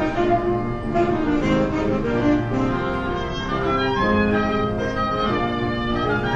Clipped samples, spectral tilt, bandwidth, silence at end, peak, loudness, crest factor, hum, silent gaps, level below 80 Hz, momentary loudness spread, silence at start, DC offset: under 0.1%; -7 dB/octave; 8.4 kHz; 0 s; -8 dBFS; -21 LUFS; 14 dB; none; none; -34 dBFS; 4 LU; 0 s; under 0.1%